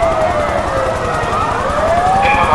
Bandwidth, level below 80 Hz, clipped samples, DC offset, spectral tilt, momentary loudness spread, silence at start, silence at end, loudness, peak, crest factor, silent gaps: 12 kHz; -28 dBFS; under 0.1%; 0.4%; -5 dB/octave; 5 LU; 0 s; 0 s; -14 LUFS; 0 dBFS; 14 dB; none